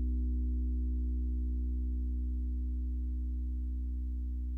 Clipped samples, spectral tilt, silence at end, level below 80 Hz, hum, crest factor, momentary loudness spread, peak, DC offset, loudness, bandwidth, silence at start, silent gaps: under 0.1%; -12 dB/octave; 0 s; -34 dBFS; none; 6 dB; 3 LU; -26 dBFS; under 0.1%; -37 LUFS; 0.4 kHz; 0 s; none